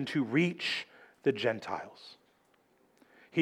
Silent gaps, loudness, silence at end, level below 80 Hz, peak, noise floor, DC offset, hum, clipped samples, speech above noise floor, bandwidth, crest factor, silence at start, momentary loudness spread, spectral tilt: none; -32 LUFS; 0 s; -82 dBFS; -14 dBFS; -69 dBFS; under 0.1%; none; under 0.1%; 37 dB; 12.5 kHz; 20 dB; 0 s; 20 LU; -6 dB/octave